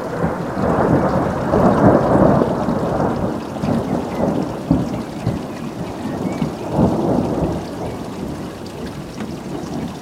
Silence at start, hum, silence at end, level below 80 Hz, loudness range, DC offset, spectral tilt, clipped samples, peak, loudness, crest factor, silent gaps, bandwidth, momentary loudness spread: 0 s; none; 0 s; -36 dBFS; 6 LU; under 0.1%; -8 dB/octave; under 0.1%; 0 dBFS; -19 LUFS; 18 dB; none; 16 kHz; 14 LU